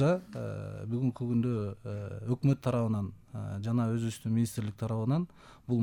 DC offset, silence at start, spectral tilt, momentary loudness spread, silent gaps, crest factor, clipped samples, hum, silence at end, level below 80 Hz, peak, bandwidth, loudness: under 0.1%; 0 s; -8 dB/octave; 10 LU; none; 14 dB; under 0.1%; none; 0 s; -62 dBFS; -16 dBFS; 16 kHz; -33 LUFS